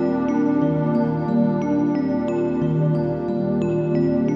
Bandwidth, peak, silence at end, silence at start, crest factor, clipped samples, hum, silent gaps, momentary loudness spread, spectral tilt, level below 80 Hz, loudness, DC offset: 7.4 kHz; -8 dBFS; 0 s; 0 s; 12 dB; under 0.1%; none; none; 3 LU; -10 dB/octave; -48 dBFS; -21 LUFS; under 0.1%